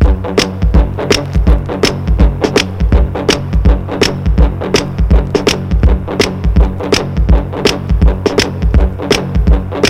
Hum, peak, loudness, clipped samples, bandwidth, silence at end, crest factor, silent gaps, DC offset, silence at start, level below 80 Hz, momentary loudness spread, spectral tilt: none; 0 dBFS; -13 LUFS; 0.4%; 13 kHz; 0 s; 10 dB; none; under 0.1%; 0 s; -14 dBFS; 2 LU; -5.5 dB/octave